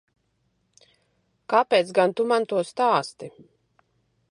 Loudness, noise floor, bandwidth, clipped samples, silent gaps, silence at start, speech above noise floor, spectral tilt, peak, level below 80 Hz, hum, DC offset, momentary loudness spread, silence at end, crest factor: -22 LUFS; -71 dBFS; 11.5 kHz; under 0.1%; none; 1.5 s; 49 dB; -4.5 dB/octave; -6 dBFS; -76 dBFS; none; under 0.1%; 17 LU; 1 s; 20 dB